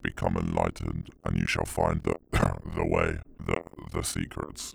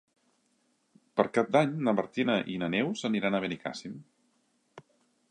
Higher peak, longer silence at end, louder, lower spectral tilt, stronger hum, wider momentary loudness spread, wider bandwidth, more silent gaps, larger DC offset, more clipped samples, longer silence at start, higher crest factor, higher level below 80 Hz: about the same, -10 dBFS vs -10 dBFS; second, 0 s vs 0.5 s; about the same, -30 LUFS vs -29 LUFS; about the same, -5.5 dB/octave vs -6 dB/octave; neither; second, 8 LU vs 13 LU; first, over 20 kHz vs 10.5 kHz; neither; neither; neither; second, 0 s vs 1.15 s; about the same, 20 dB vs 22 dB; first, -40 dBFS vs -72 dBFS